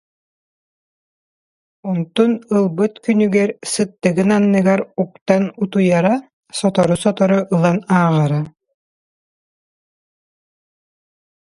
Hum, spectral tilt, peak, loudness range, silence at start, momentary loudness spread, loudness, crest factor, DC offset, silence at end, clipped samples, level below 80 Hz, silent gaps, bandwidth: none; -6.5 dB/octave; 0 dBFS; 5 LU; 1.85 s; 9 LU; -17 LUFS; 18 dB; under 0.1%; 3 s; under 0.1%; -58 dBFS; 5.21-5.26 s, 6.33-6.43 s; 11.5 kHz